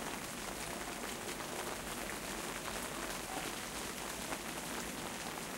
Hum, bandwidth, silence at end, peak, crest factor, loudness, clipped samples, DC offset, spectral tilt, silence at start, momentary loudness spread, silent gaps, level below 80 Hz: none; 16 kHz; 0 s; -24 dBFS; 18 dB; -41 LUFS; under 0.1%; under 0.1%; -2.5 dB/octave; 0 s; 1 LU; none; -58 dBFS